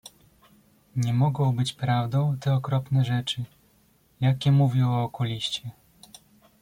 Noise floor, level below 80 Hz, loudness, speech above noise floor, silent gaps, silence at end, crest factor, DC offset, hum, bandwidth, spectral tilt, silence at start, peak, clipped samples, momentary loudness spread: -62 dBFS; -60 dBFS; -25 LUFS; 39 dB; none; 0.9 s; 14 dB; under 0.1%; none; 15 kHz; -6.5 dB/octave; 0.95 s; -10 dBFS; under 0.1%; 11 LU